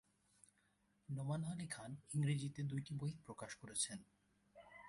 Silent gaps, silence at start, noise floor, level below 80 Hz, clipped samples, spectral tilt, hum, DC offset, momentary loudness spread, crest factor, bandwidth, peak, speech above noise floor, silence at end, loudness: none; 1.1 s; -79 dBFS; -76 dBFS; under 0.1%; -5 dB/octave; none; under 0.1%; 12 LU; 18 dB; 11.5 kHz; -28 dBFS; 35 dB; 0 s; -45 LUFS